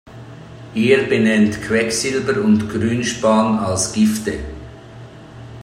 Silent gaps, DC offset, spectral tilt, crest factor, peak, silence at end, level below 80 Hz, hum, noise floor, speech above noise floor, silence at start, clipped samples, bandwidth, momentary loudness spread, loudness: none; under 0.1%; -4.5 dB/octave; 16 dB; -2 dBFS; 0 s; -44 dBFS; none; -37 dBFS; 21 dB; 0.05 s; under 0.1%; 15 kHz; 23 LU; -17 LUFS